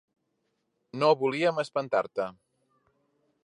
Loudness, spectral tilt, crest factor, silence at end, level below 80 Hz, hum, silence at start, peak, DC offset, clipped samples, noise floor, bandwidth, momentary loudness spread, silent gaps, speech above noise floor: -28 LUFS; -5.5 dB/octave; 20 dB; 1.1 s; -78 dBFS; none; 0.95 s; -10 dBFS; under 0.1%; under 0.1%; -77 dBFS; 11 kHz; 11 LU; none; 51 dB